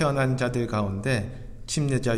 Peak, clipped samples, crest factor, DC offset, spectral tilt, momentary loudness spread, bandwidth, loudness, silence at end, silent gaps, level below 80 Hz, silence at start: -10 dBFS; under 0.1%; 16 dB; under 0.1%; -6 dB/octave; 8 LU; 13.5 kHz; -26 LUFS; 0 s; none; -44 dBFS; 0 s